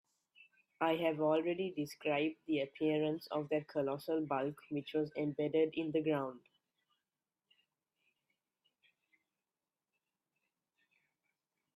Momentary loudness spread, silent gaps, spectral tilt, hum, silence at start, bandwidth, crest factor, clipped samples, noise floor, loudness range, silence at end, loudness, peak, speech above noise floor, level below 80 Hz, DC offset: 6 LU; none; -7 dB/octave; none; 0.4 s; 14.5 kHz; 20 dB; under 0.1%; under -90 dBFS; 5 LU; 5.4 s; -37 LUFS; -20 dBFS; over 54 dB; -84 dBFS; under 0.1%